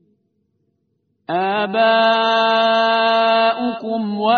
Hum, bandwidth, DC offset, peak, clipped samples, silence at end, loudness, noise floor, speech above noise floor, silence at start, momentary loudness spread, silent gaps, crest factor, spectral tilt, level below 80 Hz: none; 6.4 kHz; under 0.1%; -2 dBFS; under 0.1%; 0 s; -16 LUFS; -68 dBFS; 52 dB; 1.3 s; 8 LU; none; 14 dB; -1 dB/octave; -68 dBFS